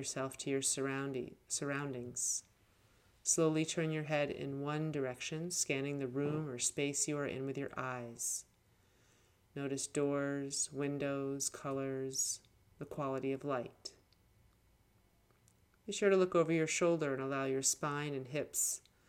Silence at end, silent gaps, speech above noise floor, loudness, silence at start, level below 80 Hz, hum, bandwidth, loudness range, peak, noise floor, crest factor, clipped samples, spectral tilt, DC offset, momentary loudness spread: 0.3 s; none; 34 dB; -37 LUFS; 0 s; -74 dBFS; none; 17 kHz; 6 LU; -18 dBFS; -71 dBFS; 20 dB; under 0.1%; -3.5 dB/octave; under 0.1%; 9 LU